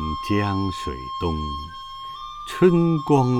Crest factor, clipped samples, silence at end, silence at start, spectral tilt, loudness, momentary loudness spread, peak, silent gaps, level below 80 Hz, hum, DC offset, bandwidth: 18 dB; under 0.1%; 0 s; 0 s; -7.5 dB/octave; -22 LUFS; 16 LU; -4 dBFS; none; -40 dBFS; none; under 0.1%; 14 kHz